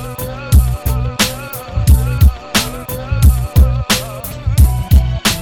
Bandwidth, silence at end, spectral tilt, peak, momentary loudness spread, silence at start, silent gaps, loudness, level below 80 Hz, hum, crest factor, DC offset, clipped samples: 17.5 kHz; 0 s; -4.5 dB/octave; 0 dBFS; 11 LU; 0 s; none; -14 LUFS; -16 dBFS; none; 12 dB; under 0.1%; under 0.1%